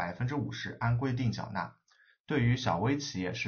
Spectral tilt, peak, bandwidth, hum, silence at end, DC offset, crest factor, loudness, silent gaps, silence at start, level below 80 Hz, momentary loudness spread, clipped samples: -5.5 dB/octave; -14 dBFS; 6.8 kHz; none; 0 s; under 0.1%; 18 dB; -32 LUFS; 2.20-2.24 s; 0 s; -56 dBFS; 9 LU; under 0.1%